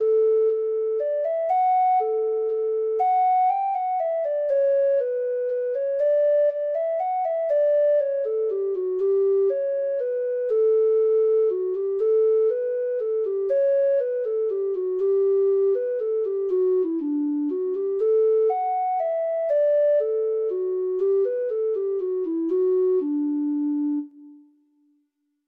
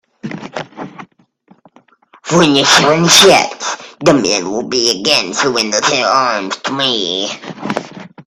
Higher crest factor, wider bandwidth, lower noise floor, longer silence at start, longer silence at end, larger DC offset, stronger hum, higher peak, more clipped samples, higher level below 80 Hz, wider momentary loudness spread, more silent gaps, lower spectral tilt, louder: second, 8 dB vs 14 dB; second, 3.8 kHz vs over 20 kHz; first, -72 dBFS vs -50 dBFS; second, 0 s vs 0.25 s; first, 1.1 s vs 0.05 s; neither; neither; second, -14 dBFS vs 0 dBFS; neither; second, -76 dBFS vs -52 dBFS; second, 6 LU vs 19 LU; neither; first, -7.5 dB/octave vs -2.5 dB/octave; second, -23 LUFS vs -12 LUFS